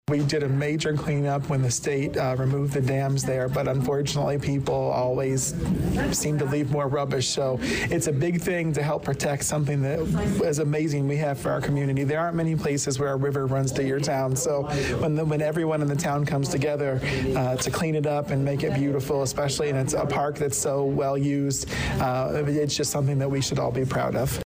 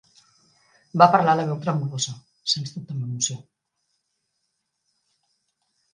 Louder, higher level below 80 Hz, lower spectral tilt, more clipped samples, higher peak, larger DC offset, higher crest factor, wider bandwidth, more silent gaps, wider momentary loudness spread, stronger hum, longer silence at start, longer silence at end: second, -25 LUFS vs -22 LUFS; first, -44 dBFS vs -72 dBFS; first, -5.5 dB/octave vs -4 dB/octave; neither; second, -16 dBFS vs 0 dBFS; neither; second, 8 dB vs 24 dB; first, 16 kHz vs 10 kHz; neither; second, 1 LU vs 16 LU; neither; second, 0.1 s vs 0.95 s; second, 0 s vs 2.55 s